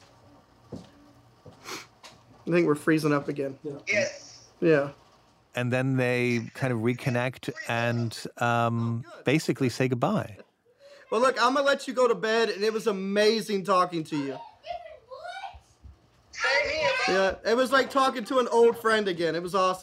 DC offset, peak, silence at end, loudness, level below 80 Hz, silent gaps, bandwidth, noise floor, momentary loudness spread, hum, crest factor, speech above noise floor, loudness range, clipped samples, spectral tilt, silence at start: under 0.1%; -8 dBFS; 0 s; -26 LUFS; -62 dBFS; none; 16 kHz; -60 dBFS; 17 LU; none; 18 dB; 34 dB; 5 LU; under 0.1%; -5.5 dB/octave; 0.7 s